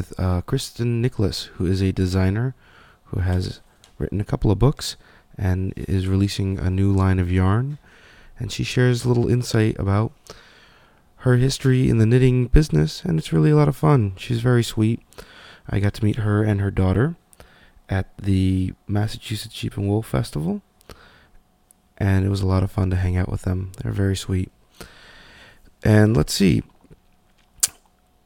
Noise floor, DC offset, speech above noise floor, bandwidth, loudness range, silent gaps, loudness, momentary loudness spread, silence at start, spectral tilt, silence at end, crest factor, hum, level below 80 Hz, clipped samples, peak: -58 dBFS; under 0.1%; 38 dB; 17.5 kHz; 6 LU; none; -21 LUFS; 11 LU; 0 s; -6.5 dB/octave; 0.55 s; 20 dB; none; -36 dBFS; under 0.1%; 0 dBFS